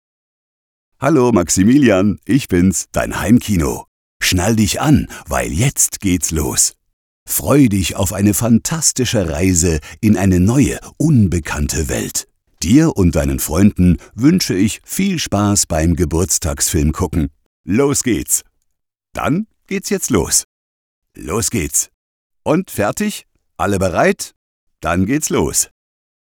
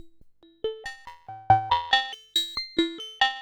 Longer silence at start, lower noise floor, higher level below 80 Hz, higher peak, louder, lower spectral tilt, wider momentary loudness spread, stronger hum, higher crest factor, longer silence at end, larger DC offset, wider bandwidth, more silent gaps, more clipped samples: first, 1 s vs 0.05 s; first, -71 dBFS vs -54 dBFS; first, -32 dBFS vs -56 dBFS; first, 0 dBFS vs -6 dBFS; first, -15 LUFS vs -25 LUFS; about the same, -4.5 dB/octave vs -3.5 dB/octave; second, 9 LU vs 19 LU; neither; second, 16 dB vs 22 dB; first, 0.7 s vs 0 s; neither; about the same, over 20 kHz vs 19.5 kHz; first, 3.88-4.20 s, 6.93-7.26 s, 17.46-17.64 s, 20.44-21.02 s, 21.94-22.30 s, 24.36-24.67 s vs none; neither